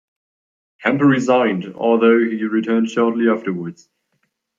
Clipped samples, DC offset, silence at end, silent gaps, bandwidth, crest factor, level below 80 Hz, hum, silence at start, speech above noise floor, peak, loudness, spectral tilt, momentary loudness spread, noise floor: under 0.1%; under 0.1%; 0.85 s; none; 7.6 kHz; 16 dB; -68 dBFS; none; 0.8 s; 53 dB; -2 dBFS; -17 LUFS; -6.5 dB/octave; 9 LU; -70 dBFS